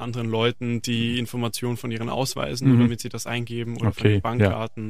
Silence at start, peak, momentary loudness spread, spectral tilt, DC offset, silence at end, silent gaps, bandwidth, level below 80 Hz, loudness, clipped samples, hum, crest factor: 0 s; -4 dBFS; 9 LU; -6 dB/octave; 0.9%; 0 s; none; 15.5 kHz; -52 dBFS; -24 LUFS; under 0.1%; none; 20 dB